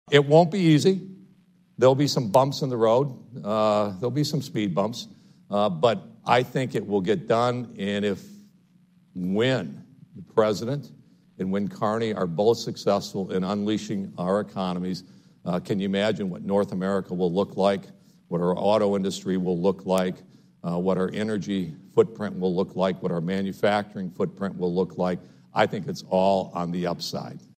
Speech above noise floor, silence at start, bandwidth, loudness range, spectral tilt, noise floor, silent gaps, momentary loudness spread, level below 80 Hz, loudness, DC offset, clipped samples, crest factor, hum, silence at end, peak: 35 dB; 0.05 s; 15.5 kHz; 4 LU; -6.5 dB/octave; -59 dBFS; none; 10 LU; -66 dBFS; -25 LUFS; under 0.1%; under 0.1%; 20 dB; none; 0.2 s; -4 dBFS